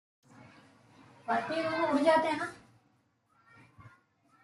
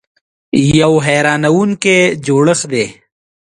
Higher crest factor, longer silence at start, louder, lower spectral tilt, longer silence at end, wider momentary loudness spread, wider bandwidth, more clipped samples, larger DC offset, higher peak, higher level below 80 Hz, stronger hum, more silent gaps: first, 22 dB vs 12 dB; second, 0.4 s vs 0.55 s; second, -30 LUFS vs -12 LUFS; about the same, -5 dB/octave vs -5 dB/octave; about the same, 0.55 s vs 0.65 s; first, 12 LU vs 7 LU; about the same, 11.5 kHz vs 11.5 kHz; neither; neither; second, -14 dBFS vs 0 dBFS; second, -76 dBFS vs -42 dBFS; neither; neither